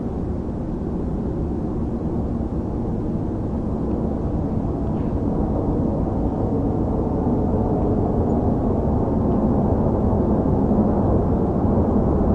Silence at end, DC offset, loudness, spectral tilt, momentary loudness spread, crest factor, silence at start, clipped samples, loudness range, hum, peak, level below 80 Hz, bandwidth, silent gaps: 0 s; under 0.1%; -22 LUFS; -11.5 dB/octave; 6 LU; 14 dB; 0 s; under 0.1%; 5 LU; none; -6 dBFS; -28 dBFS; 5.8 kHz; none